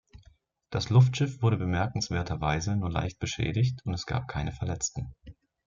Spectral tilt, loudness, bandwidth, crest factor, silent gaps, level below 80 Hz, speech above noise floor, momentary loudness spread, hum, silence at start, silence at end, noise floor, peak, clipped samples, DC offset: -5.5 dB/octave; -29 LUFS; 7.6 kHz; 18 dB; none; -48 dBFS; 33 dB; 11 LU; none; 0.15 s; 0.35 s; -61 dBFS; -10 dBFS; under 0.1%; under 0.1%